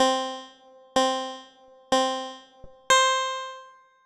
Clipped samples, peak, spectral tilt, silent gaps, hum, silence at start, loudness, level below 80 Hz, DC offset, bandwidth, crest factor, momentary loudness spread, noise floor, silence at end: under 0.1%; -6 dBFS; -0.5 dB/octave; none; none; 0 s; -24 LUFS; -62 dBFS; under 0.1%; 13.5 kHz; 20 dB; 20 LU; -53 dBFS; 0.35 s